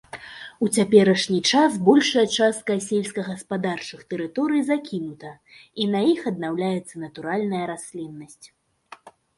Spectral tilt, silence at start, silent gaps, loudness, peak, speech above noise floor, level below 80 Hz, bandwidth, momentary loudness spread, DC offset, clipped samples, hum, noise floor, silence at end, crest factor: -4.5 dB/octave; 0.15 s; none; -22 LUFS; -2 dBFS; 27 dB; -66 dBFS; 11.5 kHz; 19 LU; under 0.1%; under 0.1%; none; -49 dBFS; 0.3 s; 20 dB